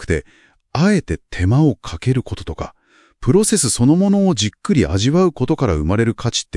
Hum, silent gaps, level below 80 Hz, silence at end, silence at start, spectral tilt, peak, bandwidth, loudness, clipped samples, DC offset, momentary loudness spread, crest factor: none; none; -36 dBFS; 0 s; 0 s; -5.5 dB/octave; -2 dBFS; 12 kHz; -17 LUFS; under 0.1%; under 0.1%; 12 LU; 16 dB